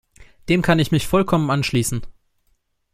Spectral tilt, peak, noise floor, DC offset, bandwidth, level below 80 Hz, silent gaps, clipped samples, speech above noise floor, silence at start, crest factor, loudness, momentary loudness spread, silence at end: -5.5 dB/octave; -2 dBFS; -66 dBFS; under 0.1%; 15.5 kHz; -40 dBFS; none; under 0.1%; 47 dB; 0.2 s; 18 dB; -19 LUFS; 9 LU; 0.85 s